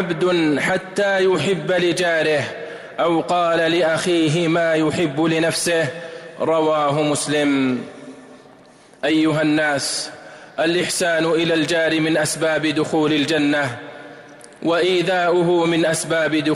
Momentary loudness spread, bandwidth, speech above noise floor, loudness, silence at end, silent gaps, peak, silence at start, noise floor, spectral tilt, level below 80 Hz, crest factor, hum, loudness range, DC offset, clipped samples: 9 LU; 15.5 kHz; 29 dB; -18 LUFS; 0 s; none; -10 dBFS; 0 s; -47 dBFS; -4.5 dB/octave; -58 dBFS; 10 dB; none; 3 LU; under 0.1%; under 0.1%